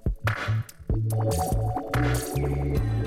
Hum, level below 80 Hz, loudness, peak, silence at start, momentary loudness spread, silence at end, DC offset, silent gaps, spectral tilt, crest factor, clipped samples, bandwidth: none; -32 dBFS; -27 LUFS; -12 dBFS; 0.05 s; 4 LU; 0 s; under 0.1%; none; -6 dB/octave; 12 dB; under 0.1%; 16 kHz